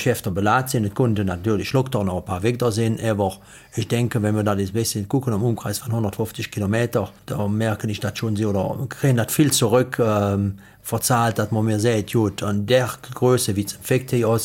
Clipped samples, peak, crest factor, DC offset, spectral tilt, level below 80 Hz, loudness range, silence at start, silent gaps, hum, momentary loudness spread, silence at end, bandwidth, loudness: under 0.1%; -4 dBFS; 16 dB; under 0.1%; -5.5 dB/octave; -52 dBFS; 3 LU; 0 s; none; none; 7 LU; 0 s; 17 kHz; -22 LUFS